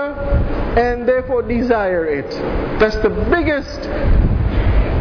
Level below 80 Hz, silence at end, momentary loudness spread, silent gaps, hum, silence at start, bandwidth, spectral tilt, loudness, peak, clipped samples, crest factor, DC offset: -20 dBFS; 0 s; 5 LU; none; none; 0 s; 5.4 kHz; -8 dB/octave; -18 LUFS; -4 dBFS; under 0.1%; 12 dB; under 0.1%